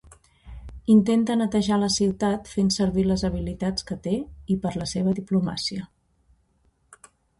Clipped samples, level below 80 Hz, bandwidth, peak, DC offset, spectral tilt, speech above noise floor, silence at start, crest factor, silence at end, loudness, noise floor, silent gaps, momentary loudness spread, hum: under 0.1%; -44 dBFS; 11.5 kHz; -8 dBFS; under 0.1%; -5.5 dB/octave; 43 dB; 0.45 s; 16 dB; 1.55 s; -24 LUFS; -66 dBFS; none; 10 LU; none